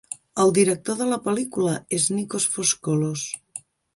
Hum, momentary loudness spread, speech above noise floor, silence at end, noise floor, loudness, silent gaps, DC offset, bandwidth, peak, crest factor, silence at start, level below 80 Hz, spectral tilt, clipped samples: none; 12 LU; 20 dB; 0.35 s; -43 dBFS; -23 LUFS; none; under 0.1%; 11.5 kHz; -6 dBFS; 18 dB; 0.1 s; -64 dBFS; -4 dB/octave; under 0.1%